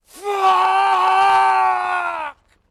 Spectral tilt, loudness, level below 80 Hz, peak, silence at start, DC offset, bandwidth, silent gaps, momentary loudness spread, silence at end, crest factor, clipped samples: -1.5 dB/octave; -16 LUFS; -62 dBFS; -8 dBFS; 0.15 s; under 0.1%; 13.5 kHz; none; 11 LU; 0.4 s; 10 dB; under 0.1%